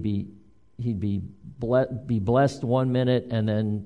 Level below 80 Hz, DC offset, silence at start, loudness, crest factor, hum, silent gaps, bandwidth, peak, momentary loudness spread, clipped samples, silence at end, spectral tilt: -52 dBFS; 0.2%; 0 s; -25 LUFS; 16 dB; none; none; 10.5 kHz; -10 dBFS; 11 LU; under 0.1%; 0 s; -8 dB/octave